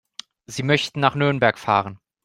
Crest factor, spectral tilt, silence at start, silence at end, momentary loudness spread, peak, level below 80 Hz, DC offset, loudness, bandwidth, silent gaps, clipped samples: 20 dB; -5 dB/octave; 0.5 s; 0.3 s; 17 LU; -2 dBFS; -58 dBFS; under 0.1%; -20 LUFS; 13 kHz; none; under 0.1%